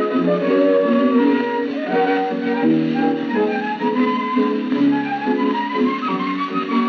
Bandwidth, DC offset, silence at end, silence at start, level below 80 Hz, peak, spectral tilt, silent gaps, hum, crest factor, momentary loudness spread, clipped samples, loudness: 6.2 kHz; under 0.1%; 0 s; 0 s; -76 dBFS; -6 dBFS; -7.5 dB/octave; none; none; 12 dB; 6 LU; under 0.1%; -18 LUFS